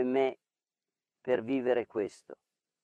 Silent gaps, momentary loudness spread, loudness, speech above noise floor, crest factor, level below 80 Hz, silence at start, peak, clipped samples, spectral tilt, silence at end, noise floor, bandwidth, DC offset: none; 12 LU; -32 LUFS; over 59 dB; 18 dB; -78 dBFS; 0 s; -16 dBFS; under 0.1%; -6.5 dB/octave; 0.5 s; under -90 dBFS; 9.6 kHz; under 0.1%